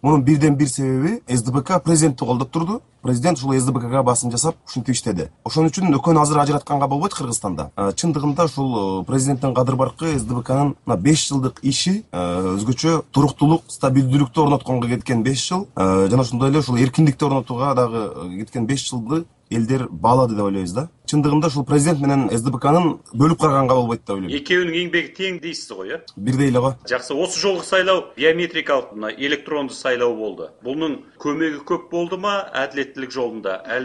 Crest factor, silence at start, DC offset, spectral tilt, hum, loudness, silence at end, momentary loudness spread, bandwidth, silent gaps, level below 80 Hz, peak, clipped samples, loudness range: 16 dB; 0.05 s; under 0.1%; -5.5 dB/octave; none; -19 LUFS; 0 s; 9 LU; 11.5 kHz; none; -48 dBFS; -2 dBFS; under 0.1%; 3 LU